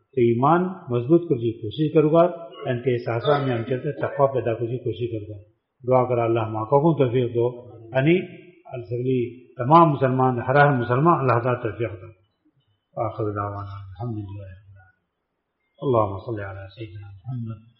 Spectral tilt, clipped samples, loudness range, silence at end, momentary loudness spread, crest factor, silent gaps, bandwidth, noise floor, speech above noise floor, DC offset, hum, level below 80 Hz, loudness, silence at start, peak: -7 dB/octave; under 0.1%; 10 LU; 0.2 s; 19 LU; 20 dB; none; 5.6 kHz; -77 dBFS; 55 dB; under 0.1%; none; -58 dBFS; -22 LUFS; 0.15 s; -4 dBFS